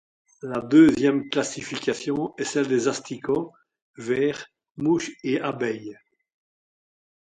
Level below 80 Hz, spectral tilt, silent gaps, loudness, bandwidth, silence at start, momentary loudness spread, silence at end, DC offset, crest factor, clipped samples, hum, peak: -62 dBFS; -5 dB/octave; 3.82-3.94 s, 4.71-4.75 s; -24 LUFS; 9.6 kHz; 0.45 s; 19 LU; 1.35 s; under 0.1%; 20 dB; under 0.1%; none; -6 dBFS